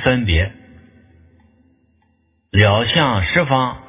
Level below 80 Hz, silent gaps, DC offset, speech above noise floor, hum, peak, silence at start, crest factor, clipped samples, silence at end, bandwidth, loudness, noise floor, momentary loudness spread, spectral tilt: -30 dBFS; none; under 0.1%; 46 dB; none; 0 dBFS; 0 s; 18 dB; under 0.1%; 0.1 s; 3.9 kHz; -16 LUFS; -62 dBFS; 6 LU; -9.5 dB/octave